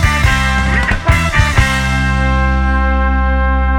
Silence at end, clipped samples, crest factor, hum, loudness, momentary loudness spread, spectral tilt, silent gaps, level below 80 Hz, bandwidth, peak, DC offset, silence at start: 0 s; under 0.1%; 12 dB; none; -13 LUFS; 2 LU; -5 dB/octave; none; -14 dBFS; 13.5 kHz; 0 dBFS; under 0.1%; 0 s